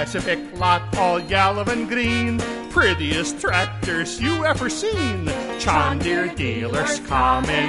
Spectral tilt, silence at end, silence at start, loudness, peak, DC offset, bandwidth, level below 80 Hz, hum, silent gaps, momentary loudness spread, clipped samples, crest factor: -4.5 dB/octave; 0 s; 0 s; -21 LUFS; -4 dBFS; under 0.1%; 11.5 kHz; -36 dBFS; none; none; 5 LU; under 0.1%; 18 dB